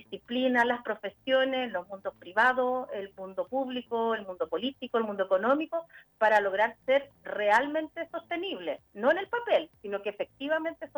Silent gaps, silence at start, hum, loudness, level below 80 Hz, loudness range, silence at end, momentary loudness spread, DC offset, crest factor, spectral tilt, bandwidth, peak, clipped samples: none; 0.1 s; none; -29 LUFS; -72 dBFS; 3 LU; 0.1 s; 12 LU; under 0.1%; 22 dB; -4.5 dB/octave; over 20 kHz; -8 dBFS; under 0.1%